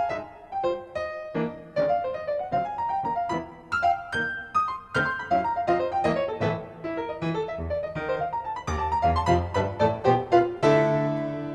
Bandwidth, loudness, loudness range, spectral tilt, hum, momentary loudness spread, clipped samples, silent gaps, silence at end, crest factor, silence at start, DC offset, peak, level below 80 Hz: 10.5 kHz; -26 LUFS; 5 LU; -7 dB/octave; none; 10 LU; under 0.1%; none; 0 s; 20 dB; 0 s; under 0.1%; -6 dBFS; -46 dBFS